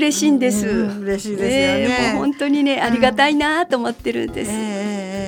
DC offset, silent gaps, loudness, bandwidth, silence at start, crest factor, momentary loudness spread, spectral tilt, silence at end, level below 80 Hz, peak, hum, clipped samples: under 0.1%; none; -18 LUFS; 18 kHz; 0 s; 18 dB; 8 LU; -4 dB/octave; 0 s; -44 dBFS; 0 dBFS; none; under 0.1%